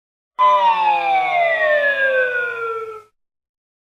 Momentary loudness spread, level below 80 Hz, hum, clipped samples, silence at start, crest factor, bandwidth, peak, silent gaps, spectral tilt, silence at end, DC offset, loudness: 12 LU; -70 dBFS; none; under 0.1%; 0.4 s; 12 dB; 9.2 kHz; -6 dBFS; none; -2.5 dB/octave; 0.8 s; under 0.1%; -16 LUFS